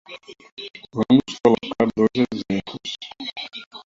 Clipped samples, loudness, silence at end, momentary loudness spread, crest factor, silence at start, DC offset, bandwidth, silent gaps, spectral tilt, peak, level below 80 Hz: under 0.1%; -22 LUFS; 0.05 s; 18 LU; 18 dB; 0.1 s; under 0.1%; 7.8 kHz; 0.52-0.57 s, 3.66-3.71 s; -6 dB/octave; -4 dBFS; -56 dBFS